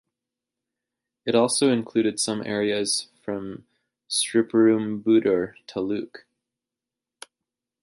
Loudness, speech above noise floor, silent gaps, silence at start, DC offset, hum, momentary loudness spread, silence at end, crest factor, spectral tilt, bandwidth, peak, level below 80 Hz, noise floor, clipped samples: -23 LUFS; 65 dB; none; 1.25 s; under 0.1%; none; 13 LU; 1.65 s; 18 dB; -4 dB/octave; 11.5 kHz; -8 dBFS; -66 dBFS; -88 dBFS; under 0.1%